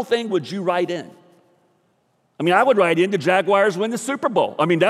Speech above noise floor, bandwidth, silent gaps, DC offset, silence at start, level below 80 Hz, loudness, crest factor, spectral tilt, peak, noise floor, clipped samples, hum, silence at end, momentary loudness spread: 46 dB; 14 kHz; none; under 0.1%; 0 s; -72 dBFS; -19 LUFS; 16 dB; -5 dB/octave; -4 dBFS; -65 dBFS; under 0.1%; none; 0 s; 8 LU